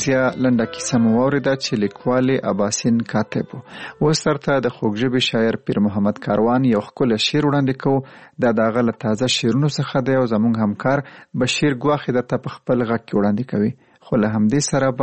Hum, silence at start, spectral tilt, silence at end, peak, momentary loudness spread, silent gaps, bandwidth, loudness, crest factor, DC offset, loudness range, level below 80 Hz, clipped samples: none; 0 s; -5.5 dB/octave; 0 s; -6 dBFS; 5 LU; none; 8.8 kHz; -19 LUFS; 14 dB; 0.1%; 2 LU; -52 dBFS; under 0.1%